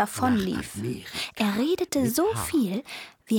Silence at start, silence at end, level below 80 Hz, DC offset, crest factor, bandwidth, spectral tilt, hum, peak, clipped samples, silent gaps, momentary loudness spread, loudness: 0 s; 0 s; -54 dBFS; under 0.1%; 16 dB; 19.5 kHz; -4.5 dB/octave; none; -10 dBFS; under 0.1%; none; 9 LU; -26 LUFS